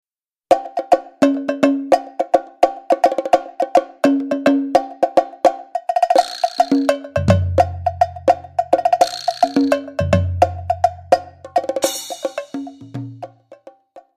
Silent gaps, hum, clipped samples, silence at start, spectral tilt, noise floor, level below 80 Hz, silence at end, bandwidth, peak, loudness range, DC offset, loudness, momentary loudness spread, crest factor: none; none; under 0.1%; 0.5 s; -6 dB/octave; -44 dBFS; -44 dBFS; 0.2 s; 15.5 kHz; 0 dBFS; 3 LU; under 0.1%; -18 LUFS; 10 LU; 18 dB